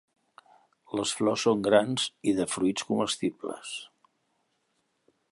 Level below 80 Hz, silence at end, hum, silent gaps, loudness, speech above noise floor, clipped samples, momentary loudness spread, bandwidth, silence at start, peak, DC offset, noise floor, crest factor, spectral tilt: -68 dBFS; 1.45 s; none; none; -28 LUFS; 48 dB; under 0.1%; 14 LU; 11.5 kHz; 0.9 s; -8 dBFS; under 0.1%; -75 dBFS; 22 dB; -4 dB/octave